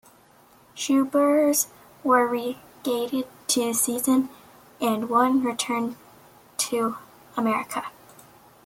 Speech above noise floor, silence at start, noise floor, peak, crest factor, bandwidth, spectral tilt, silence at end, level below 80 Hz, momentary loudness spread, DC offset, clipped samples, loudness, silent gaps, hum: 32 dB; 0.75 s; -55 dBFS; -6 dBFS; 18 dB; 16.5 kHz; -2.5 dB/octave; 0.75 s; -70 dBFS; 13 LU; under 0.1%; under 0.1%; -24 LUFS; none; none